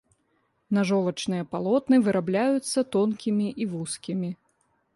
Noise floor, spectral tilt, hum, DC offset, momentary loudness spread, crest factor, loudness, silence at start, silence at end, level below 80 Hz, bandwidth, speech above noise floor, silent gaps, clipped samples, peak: -71 dBFS; -6 dB/octave; none; under 0.1%; 10 LU; 16 dB; -26 LUFS; 0.7 s; 0.6 s; -66 dBFS; 11.5 kHz; 46 dB; none; under 0.1%; -10 dBFS